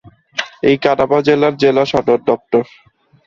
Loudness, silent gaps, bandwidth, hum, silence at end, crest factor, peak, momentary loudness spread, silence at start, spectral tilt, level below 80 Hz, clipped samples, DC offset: -14 LUFS; none; 7.2 kHz; none; 0.65 s; 14 dB; 0 dBFS; 11 LU; 0.05 s; -6 dB/octave; -52 dBFS; under 0.1%; under 0.1%